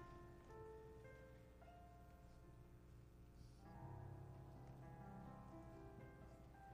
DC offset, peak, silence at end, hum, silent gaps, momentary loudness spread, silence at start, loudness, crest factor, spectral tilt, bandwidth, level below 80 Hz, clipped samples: under 0.1%; -46 dBFS; 0 s; 60 Hz at -65 dBFS; none; 7 LU; 0 s; -61 LUFS; 14 dB; -7.5 dB/octave; 15 kHz; -66 dBFS; under 0.1%